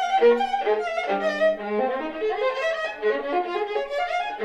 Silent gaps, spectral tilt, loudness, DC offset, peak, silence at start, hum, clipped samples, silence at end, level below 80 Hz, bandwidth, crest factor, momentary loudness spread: none; -4 dB/octave; -24 LUFS; under 0.1%; -8 dBFS; 0 s; none; under 0.1%; 0 s; -60 dBFS; 9.2 kHz; 14 dB; 7 LU